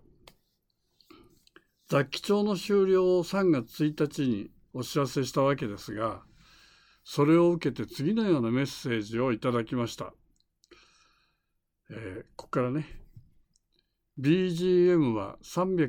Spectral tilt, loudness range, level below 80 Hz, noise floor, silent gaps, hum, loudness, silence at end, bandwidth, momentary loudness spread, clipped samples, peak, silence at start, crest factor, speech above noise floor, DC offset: -6.5 dB/octave; 11 LU; -60 dBFS; -79 dBFS; none; none; -28 LUFS; 0 s; 17.5 kHz; 17 LU; under 0.1%; -12 dBFS; 1.9 s; 16 dB; 52 dB; under 0.1%